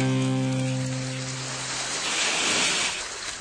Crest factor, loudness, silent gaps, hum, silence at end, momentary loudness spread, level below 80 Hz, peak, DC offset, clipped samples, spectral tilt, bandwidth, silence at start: 16 dB; -25 LUFS; none; none; 0 s; 9 LU; -58 dBFS; -10 dBFS; under 0.1%; under 0.1%; -3 dB/octave; 10.5 kHz; 0 s